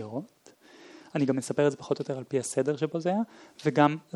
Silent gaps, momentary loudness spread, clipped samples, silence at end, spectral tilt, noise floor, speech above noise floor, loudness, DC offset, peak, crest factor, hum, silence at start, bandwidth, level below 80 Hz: none; 11 LU; under 0.1%; 0.15 s; -6 dB/octave; -56 dBFS; 29 dB; -29 LUFS; under 0.1%; -6 dBFS; 22 dB; none; 0 s; 12.5 kHz; -78 dBFS